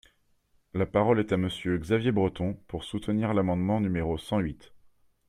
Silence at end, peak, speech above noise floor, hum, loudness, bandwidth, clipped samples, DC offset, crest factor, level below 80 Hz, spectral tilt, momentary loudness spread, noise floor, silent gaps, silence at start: 0.5 s; -10 dBFS; 40 dB; none; -28 LUFS; 13 kHz; under 0.1%; under 0.1%; 20 dB; -52 dBFS; -7.5 dB/octave; 11 LU; -68 dBFS; none; 0.75 s